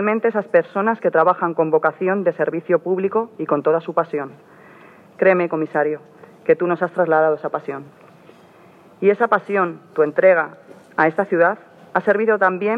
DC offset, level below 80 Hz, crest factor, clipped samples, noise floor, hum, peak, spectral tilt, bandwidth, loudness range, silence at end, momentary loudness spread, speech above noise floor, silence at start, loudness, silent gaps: under 0.1%; -74 dBFS; 18 dB; under 0.1%; -47 dBFS; none; -2 dBFS; -9 dB/octave; 5 kHz; 3 LU; 0 s; 10 LU; 29 dB; 0 s; -19 LUFS; none